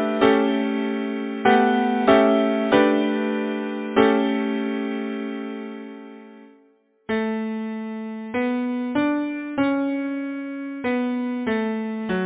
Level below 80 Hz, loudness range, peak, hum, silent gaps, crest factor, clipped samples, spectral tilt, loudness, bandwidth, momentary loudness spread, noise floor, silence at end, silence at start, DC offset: -58 dBFS; 10 LU; -2 dBFS; none; none; 20 dB; under 0.1%; -9.5 dB/octave; -22 LUFS; 4 kHz; 13 LU; -59 dBFS; 0 s; 0 s; under 0.1%